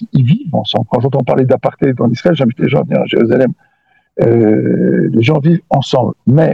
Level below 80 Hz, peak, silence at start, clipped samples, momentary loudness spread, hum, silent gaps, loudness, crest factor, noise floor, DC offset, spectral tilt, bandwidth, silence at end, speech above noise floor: -50 dBFS; 0 dBFS; 0 s; 0.1%; 4 LU; none; none; -12 LUFS; 12 dB; -56 dBFS; under 0.1%; -8.5 dB/octave; 7.6 kHz; 0 s; 45 dB